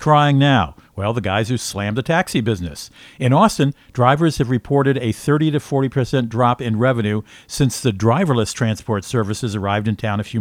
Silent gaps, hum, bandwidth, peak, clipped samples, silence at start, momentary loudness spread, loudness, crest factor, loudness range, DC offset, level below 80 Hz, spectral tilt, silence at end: none; none; 16 kHz; 0 dBFS; under 0.1%; 0 s; 8 LU; -18 LUFS; 18 dB; 2 LU; under 0.1%; -44 dBFS; -6 dB/octave; 0 s